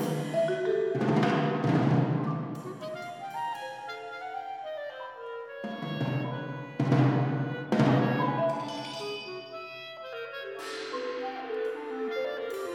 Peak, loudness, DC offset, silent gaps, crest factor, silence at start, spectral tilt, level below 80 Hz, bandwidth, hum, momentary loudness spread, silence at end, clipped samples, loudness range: -10 dBFS; -31 LUFS; under 0.1%; none; 20 dB; 0 s; -7.5 dB/octave; -78 dBFS; 14 kHz; none; 14 LU; 0 s; under 0.1%; 9 LU